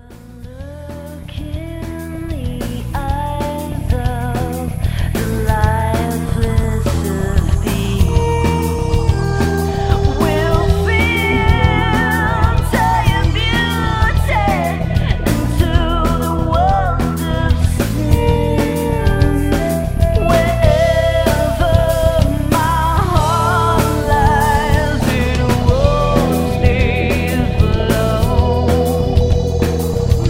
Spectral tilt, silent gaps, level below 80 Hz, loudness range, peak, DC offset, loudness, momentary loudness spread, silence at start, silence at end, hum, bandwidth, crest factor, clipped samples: -6.5 dB/octave; none; -20 dBFS; 5 LU; 0 dBFS; under 0.1%; -15 LUFS; 8 LU; 0.1 s; 0 s; none; 16.5 kHz; 14 dB; under 0.1%